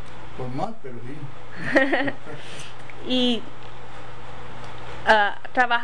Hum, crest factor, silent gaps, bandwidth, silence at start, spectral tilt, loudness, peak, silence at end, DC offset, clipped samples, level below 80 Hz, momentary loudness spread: none; 20 dB; none; 10 kHz; 0 s; -5 dB/octave; -23 LUFS; -6 dBFS; 0 s; 6%; under 0.1%; -52 dBFS; 21 LU